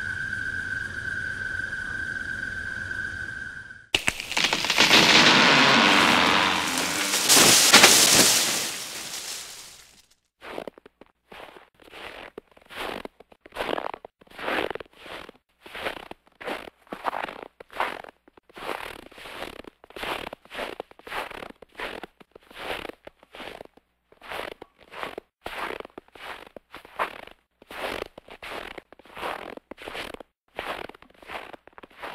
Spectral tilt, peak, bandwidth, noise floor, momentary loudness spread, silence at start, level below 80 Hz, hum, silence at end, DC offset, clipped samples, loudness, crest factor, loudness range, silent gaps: -1 dB/octave; 0 dBFS; 16 kHz; -60 dBFS; 26 LU; 0 s; -56 dBFS; none; 0 s; under 0.1%; under 0.1%; -21 LUFS; 26 dB; 22 LU; none